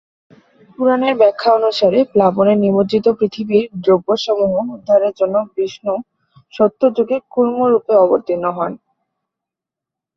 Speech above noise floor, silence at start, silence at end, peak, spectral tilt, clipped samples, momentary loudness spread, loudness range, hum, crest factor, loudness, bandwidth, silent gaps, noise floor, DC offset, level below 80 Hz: 70 dB; 0.8 s; 1.4 s; -2 dBFS; -7 dB/octave; under 0.1%; 8 LU; 3 LU; none; 14 dB; -15 LUFS; 7.4 kHz; none; -85 dBFS; under 0.1%; -58 dBFS